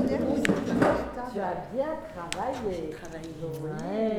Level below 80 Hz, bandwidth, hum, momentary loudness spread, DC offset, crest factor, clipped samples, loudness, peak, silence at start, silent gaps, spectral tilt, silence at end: -50 dBFS; 18 kHz; none; 12 LU; under 0.1%; 22 dB; under 0.1%; -30 LUFS; -6 dBFS; 0 s; none; -6 dB/octave; 0 s